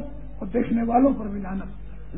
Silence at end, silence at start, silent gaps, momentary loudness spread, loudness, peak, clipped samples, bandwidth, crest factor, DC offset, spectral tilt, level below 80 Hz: 0 s; 0 s; none; 19 LU; -24 LUFS; -8 dBFS; under 0.1%; 3.8 kHz; 18 dB; 2%; -12.5 dB/octave; -40 dBFS